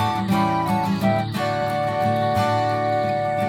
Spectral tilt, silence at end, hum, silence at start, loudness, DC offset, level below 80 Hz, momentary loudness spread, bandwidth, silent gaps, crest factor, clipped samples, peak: -6.5 dB/octave; 0 s; none; 0 s; -21 LUFS; under 0.1%; -54 dBFS; 2 LU; 17.5 kHz; none; 12 dB; under 0.1%; -8 dBFS